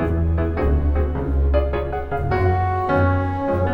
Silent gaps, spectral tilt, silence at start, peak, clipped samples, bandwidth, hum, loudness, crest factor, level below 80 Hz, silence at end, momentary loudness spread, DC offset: none; -10 dB/octave; 0 s; -6 dBFS; under 0.1%; 5.2 kHz; none; -21 LUFS; 14 dB; -24 dBFS; 0 s; 5 LU; under 0.1%